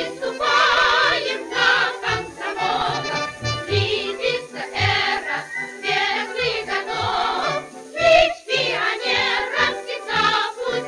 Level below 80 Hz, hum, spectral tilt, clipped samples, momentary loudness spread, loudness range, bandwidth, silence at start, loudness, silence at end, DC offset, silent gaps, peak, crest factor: -50 dBFS; none; -3 dB/octave; under 0.1%; 10 LU; 3 LU; 12 kHz; 0 s; -20 LUFS; 0 s; under 0.1%; none; -2 dBFS; 20 dB